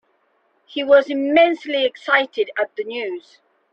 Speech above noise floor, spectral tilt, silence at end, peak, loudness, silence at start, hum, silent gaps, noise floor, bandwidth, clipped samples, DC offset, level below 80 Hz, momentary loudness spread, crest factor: 45 dB; -3.5 dB/octave; 0.55 s; -2 dBFS; -19 LUFS; 0.7 s; none; none; -64 dBFS; 6.8 kHz; under 0.1%; under 0.1%; -68 dBFS; 13 LU; 18 dB